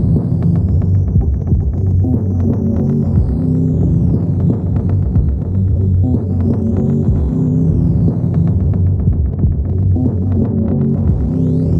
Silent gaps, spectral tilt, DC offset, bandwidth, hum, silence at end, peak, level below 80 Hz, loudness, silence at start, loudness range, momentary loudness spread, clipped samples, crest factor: none; -12.5 dB/octave; under 0.1%; 2 kHz; none; 0 s; 0 dBFS; -22 dBFS; -15 LUFS; 0 s; 1 LU; 2 LU; under 0.1%; 12 dB